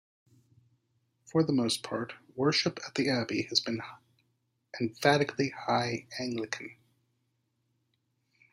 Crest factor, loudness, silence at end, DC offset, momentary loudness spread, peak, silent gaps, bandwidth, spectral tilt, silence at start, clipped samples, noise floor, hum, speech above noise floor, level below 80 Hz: 24 dB; -30 LUFS; 1.8 s; under 0.1%; 11 LU; -10 dBFS; none; 15.5 kHz; -4.5 dB/octave; 1.35 s; under 0.1%; -77 dBFS; none; 47 dB; -74 dBFS